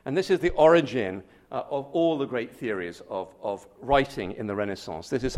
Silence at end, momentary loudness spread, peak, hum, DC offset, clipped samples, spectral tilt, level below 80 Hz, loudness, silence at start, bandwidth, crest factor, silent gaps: 0 s; 16 LU; -6 dBFS; none; under 0.1%; under 0.1%; -6 dB/octave; -48 dBFS; -26 LUFS; 0.05 s; 13.5 kHz; 20 dB; none